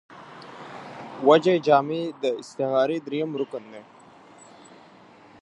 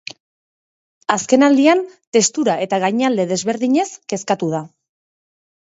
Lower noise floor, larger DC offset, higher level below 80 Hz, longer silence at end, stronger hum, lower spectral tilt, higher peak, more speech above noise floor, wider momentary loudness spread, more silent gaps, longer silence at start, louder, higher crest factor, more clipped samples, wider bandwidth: second, -51 dBFS vs under -90 dBFS; neither; second, -76 dBFS vs -68 dBFS; first, 1.6 s vs 1.1 s; neither; first, -6 dB/octave vs -4 dB/octave; about the same, -2 dBFS vs 0 dBFS; second, 28 dB vs over 74 dB; first, 24 LU vs 11 LU; second, none vs 2.07-2.12 s; second, 0.1 s vs 1.1 s; second, -23 LUFS vs -17 LUFS; about the same, 22 dB vs 18 dB; neither; first, 10.5 kHz vs 8 kHz